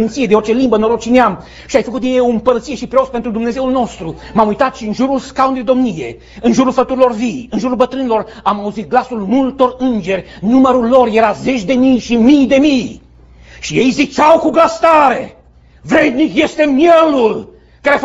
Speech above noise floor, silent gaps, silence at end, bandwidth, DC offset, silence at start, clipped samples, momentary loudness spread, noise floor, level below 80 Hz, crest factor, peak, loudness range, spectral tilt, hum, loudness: 28 dB; none; 0 s; 8 kHz; under 0.1%; 0 s; under 0.1%; 9 LU; -40 dBFS; -42 dBFS; 12 dB; 0 dBFS; 4 LU; -5.5 dB/octave; none; -12 LUFS